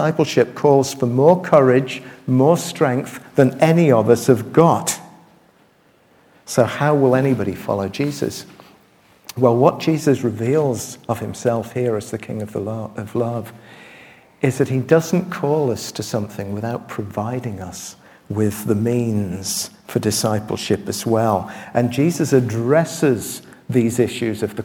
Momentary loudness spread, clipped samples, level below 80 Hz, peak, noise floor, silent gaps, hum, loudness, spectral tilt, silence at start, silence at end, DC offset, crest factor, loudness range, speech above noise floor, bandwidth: 12 LU; under 0.1%; -58 dBFS; 0 dBFS; -55 dBFS; none; none; -19 LUFS; -6 dB/octave; 0 s; 0 s; under 0.1%; 18 dB; 8 LU; 37 dB; 18.5 kHz